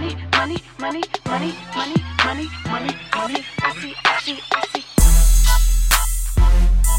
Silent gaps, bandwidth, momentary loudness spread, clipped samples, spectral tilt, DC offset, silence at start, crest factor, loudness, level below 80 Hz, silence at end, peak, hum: none; 16.5 kHz; 9 LU; under 0.1%; -3.5 dB/octave; under 0.1%; 0 s; 16 dB; -20 LUFS; -18 dBFS; 0 s; 0 dBFS; none